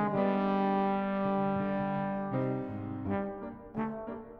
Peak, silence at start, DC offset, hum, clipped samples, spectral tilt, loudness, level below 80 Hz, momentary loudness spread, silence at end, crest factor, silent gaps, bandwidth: -16 dBFS; 0 s; under 0.1%; none; under 0.1%; -10 dB/octave; -33 LUFS; -60 dBFS; 10 LU; 0 s; 16 dB; none; 5 kHz